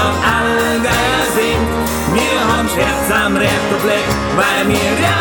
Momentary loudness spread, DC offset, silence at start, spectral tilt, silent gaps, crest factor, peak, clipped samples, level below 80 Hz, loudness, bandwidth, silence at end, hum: 2 LU; under 0.1%; 0 s; -4 dB/octave; none; 14 dB; 0 dBFS; under 0.1%; -30 dBFS; -14 LUFS; 19.5 kHz; 0 s; none